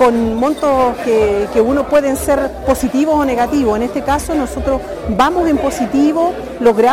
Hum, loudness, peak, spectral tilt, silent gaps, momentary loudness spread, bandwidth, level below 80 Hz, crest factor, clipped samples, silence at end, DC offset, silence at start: none; -15 LUFS; 0 dBFS; -5.5 dB/octave; none; 5 LU; 16.5 kHz; -32 dBFS; 12 dB; under 0.1%; 0 s; under 0.1%; 0 s